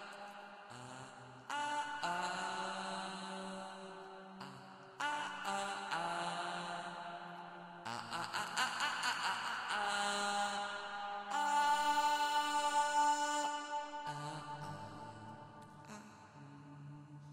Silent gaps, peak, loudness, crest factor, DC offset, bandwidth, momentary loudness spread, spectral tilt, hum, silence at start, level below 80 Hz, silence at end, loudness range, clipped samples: none; -22 dBFS; -38 LUFS; 18 dB; under 0.1%; 16 kHz; 20 LU; -2 dB/octave; none; 0 s; -80 dBFS; 0 s; 9 LU; under 0.1%